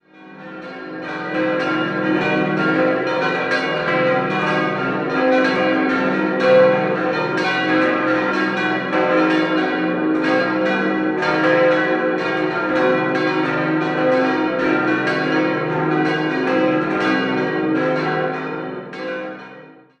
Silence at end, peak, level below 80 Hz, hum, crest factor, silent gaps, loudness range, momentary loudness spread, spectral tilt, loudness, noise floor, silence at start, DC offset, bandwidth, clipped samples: 0.3 s; -2 dBFS; -58 dBFS; none; 16 dB; none; 3 LU; 10 LU; -6.5 dB/octave; -18 LUFS; -42 dBFS; 0.2 s; under 0.1%; 8.4 kHz; under 0.1%